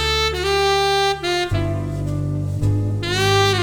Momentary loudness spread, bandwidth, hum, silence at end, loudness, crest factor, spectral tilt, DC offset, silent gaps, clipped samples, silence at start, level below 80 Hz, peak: 7 LU; 19.5 kHz; none; 0 s; -19 LUFS; 12 dB; -4.5 dB/octave; under 0.1%; none; under 0.1%; 0 s; -34 dBFS; -6 dBFS